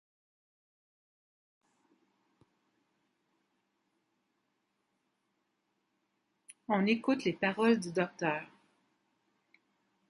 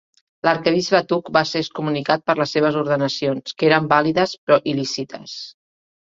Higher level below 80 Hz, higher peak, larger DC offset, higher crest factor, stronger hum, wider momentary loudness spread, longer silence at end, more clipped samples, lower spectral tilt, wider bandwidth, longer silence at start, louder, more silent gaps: second, -82 dBFS vs -62 dBFS; second, -16 dBFS vs -2 dBFS; neither; about the same, 22 dB vs 18 dB; neither; second, 6 LU vs 10 LU; first, 1.65 s vs 0.55 s; neither; about the same, -6 dB/octave vs -5 dB/octave; first, 11 kHz vs 7.8 kHz; first, 6.7 s vs 0.45 s; second, -32 LUFS vs -19 LUFS; second, none vs 4.38-4.47 s